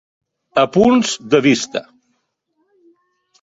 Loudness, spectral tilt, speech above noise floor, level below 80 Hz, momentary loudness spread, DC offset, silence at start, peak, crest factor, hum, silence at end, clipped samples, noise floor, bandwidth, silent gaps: -15 LUFS; -4.5 dB/octave; 54 dB; -54 dBFS; 10 LU; under 0.1%; 0.55 s; -2 dBFS; 16 dB; none; 1.6 s; under 0.1%; -68 dBFS; 8 kHz; none